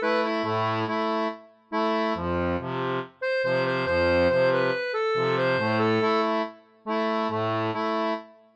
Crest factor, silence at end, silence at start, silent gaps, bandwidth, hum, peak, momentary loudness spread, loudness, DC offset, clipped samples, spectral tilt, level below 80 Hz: 14 dB; 0.25 s; 0 s; none; 8.4 kHz; none; -12 dBFS; 8 LU; -25 LUFS; under 0.1%; under 0.1%; -7 dB/octave; -54 dBFS